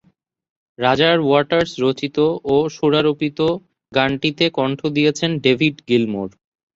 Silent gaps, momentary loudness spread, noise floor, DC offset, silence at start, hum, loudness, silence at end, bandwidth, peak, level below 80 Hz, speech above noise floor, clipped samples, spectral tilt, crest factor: none; 6 LU; -61 dBFS; under 0.1%; 0.8 s; none; -18 LUFS; 0.45 s; 7.8 kHz; -2 dBFS; -54 dBFS; 44 dB; under 0.1%; -5.5 dB/octave; 16 dB